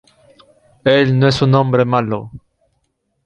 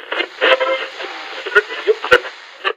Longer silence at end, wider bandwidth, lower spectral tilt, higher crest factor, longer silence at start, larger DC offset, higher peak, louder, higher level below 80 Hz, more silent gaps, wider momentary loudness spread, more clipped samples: first, 0.9 s vs 0.05 s; second, 9 kHz vs 15.5 kHz; first, -7 dB/octave vs -2 dB/octave; about the same, 16 dB vs 18 dB; first, 0.85 s vs 0 s; neither; about the same, -2 dBFS vs 0 dBFS; about the same, -14 LUFS vs -16 LUFS; first, -50 dBFS vs -56 dBFS; neither; about the same, 11 LU vs 13 LU; neither